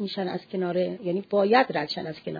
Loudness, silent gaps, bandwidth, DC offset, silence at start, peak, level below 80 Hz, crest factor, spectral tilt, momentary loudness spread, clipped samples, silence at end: -26 LUFS; none; 5 kHz; under 0.1%; 0 s; -8 dBFS; -72 dBFS; 18 dB; -7.5 dB/octave; 10 LU; under 0.1%; 0 s